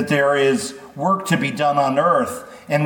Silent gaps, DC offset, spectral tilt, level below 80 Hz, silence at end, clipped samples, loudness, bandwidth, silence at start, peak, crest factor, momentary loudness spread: none; under 0.1%; -5 dB/octave; -62 dBFS; 0 s; under 0.1%; -19 LUFS; 19 kHz; 0 s; -4 dBFS; 16 dB; 9 LU